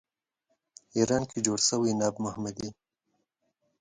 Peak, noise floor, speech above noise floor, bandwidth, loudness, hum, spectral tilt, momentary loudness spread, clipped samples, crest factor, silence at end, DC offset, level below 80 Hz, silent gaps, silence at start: -10 dBFS; -79 dBFS; 50 dB; 9.6 kHz; -28 LUFS; none; -4 dB/octave; 11 LU; under 0.1%; 22 dB; 1.1 s; under 0.1%; -62 dBFS; none; 0.95 s